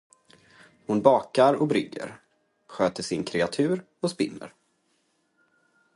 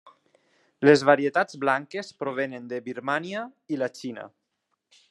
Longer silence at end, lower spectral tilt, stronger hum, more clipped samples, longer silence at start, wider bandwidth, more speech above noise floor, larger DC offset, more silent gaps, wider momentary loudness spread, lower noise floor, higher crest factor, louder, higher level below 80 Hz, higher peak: first, 1.5 s vs 0.85 s; about the same, -5.5 dB/octave vs -5.5 dB/octave; neither; neither; about the same, 0.9 s vs 0.8 s; about the same, 11.5 kHz vs 10.5 kHz; second, 46 dB vs 53 dB; neither; neither; about the same, 20 LU vs 18 LU; second, -71 dBFS vs -78 dBFS; about the same, 24 dB vs 24 dB; about the same, -25 LUFS vs -25 LUFS; first, -66 dBFS vs -74 dBFS; about the same, -4 dBFS vs -2 dBFS